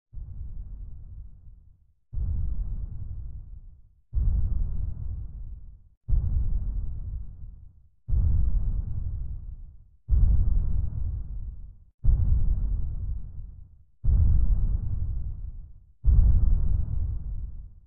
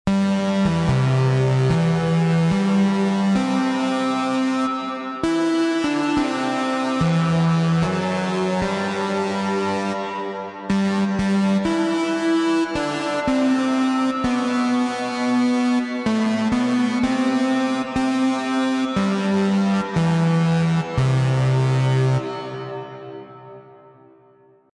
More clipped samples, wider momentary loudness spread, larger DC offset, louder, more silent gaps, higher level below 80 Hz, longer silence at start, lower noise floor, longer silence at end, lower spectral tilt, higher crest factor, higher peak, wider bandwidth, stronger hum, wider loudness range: neither; first, 21 LU vs 5 LU; neither; second, -30 LUFS vs -20 LUFS; first, 5.97-6.01 s, 11.94-11.98 s vs none; first, -28 dBFS vs -48 dBFS; about the same, 0.15 s vs 0.05 s; first, -57 dBFS vs -53 dBFS; second, 0.15 s vs 1 s; first, -14.5 dB/octave vs -6.5 dB/octave; first, 18 dB vs 12 dB; about the same, -8 dBFS vs -8 dBFS; second, 1.4 kHz vs 11 kHz; neither; first, 7 LU vs 3 LU